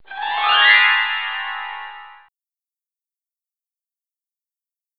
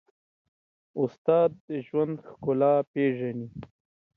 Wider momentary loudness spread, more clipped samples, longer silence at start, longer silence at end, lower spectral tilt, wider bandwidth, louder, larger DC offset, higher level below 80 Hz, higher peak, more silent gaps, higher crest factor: first, 20 LU vs 15 LU; neither; second, 0.1 s vs 0.95 s; first, 2.85 s vs 0.5 s; second, -1.5 dB/octave vs -10 dB/octave; about the same, 5 kHz vs 4.7 kHz; first, -15 LUFS vs -27 LUFS; neither; about the same, -70 dBFS vs -66 dBFS; first, 0 dBFS vs -10 dBFS; second, none vs 1.18-1.25 s, 1.60-1.68 s, 2.87-2.94 s; about the same, 22 dB vs 18 dB